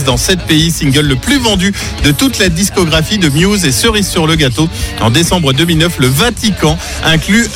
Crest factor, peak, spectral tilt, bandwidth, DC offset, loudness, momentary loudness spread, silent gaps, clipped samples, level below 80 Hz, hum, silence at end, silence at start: 10 dB; 0 dBFS; -4 dB/octave; 17 kHz; under 0.1%; -10 LUFS; 3 LU; none; under 0.1%; -24 dBFS; none; 0 s; 0 s